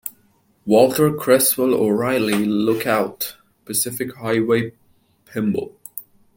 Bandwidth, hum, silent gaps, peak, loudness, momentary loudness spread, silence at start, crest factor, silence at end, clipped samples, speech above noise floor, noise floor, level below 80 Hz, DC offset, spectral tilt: 17 kHz; none; none; -2 dBFS; -19 LUFS; 17 LU; 0.05 s; 18 dB; 0.35 s; under 0.1%; 41 dB; -59 dBFS; -60 dBFS; under 0.1%; -4.5 dB/octave